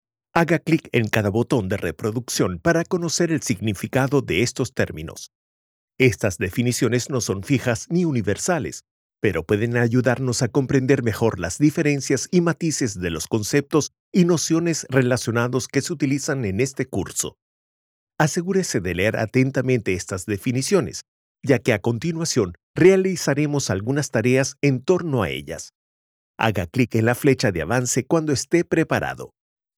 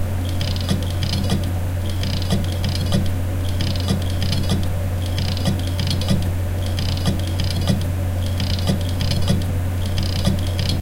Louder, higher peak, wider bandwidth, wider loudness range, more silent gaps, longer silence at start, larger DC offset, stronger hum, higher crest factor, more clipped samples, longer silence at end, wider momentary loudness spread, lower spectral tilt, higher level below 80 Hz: about the same, -21 LUFS vs -22 LUFS; about the same, -2 dBFS vs -4 dBFS; about the same, 17 kHz vs 16.5 kHz; about the same, 3 LU vs 1 LU; first, 5.35-5.88 s, 8.91-9.09 s, 14.00-14.12 s, 17.42-18.07 s, 21.08-21.35 s, 22.63-22.74 s, 25.75-26.34 s vs none; first, 0.35 s vs 0 s; neither; neither; about the same, 18 dB vs 16 dB; neither; first, 0.5 s vs 0 s; first, 7 LU vs 3 LU; about the same, -5 dB/octave vs -5.5 dB/octave; second, -50 dBFS vs -30 dBFS